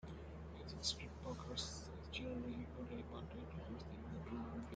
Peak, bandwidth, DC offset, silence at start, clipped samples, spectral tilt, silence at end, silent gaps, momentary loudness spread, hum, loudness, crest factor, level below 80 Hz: -28 dBFS; 9 kHz; under 0.1%; 0 s; under 0.1%; -4.5 dB/octave; 0 s; none; 9 LU; none; -48 LUFS; 20 dB; -58 dBFS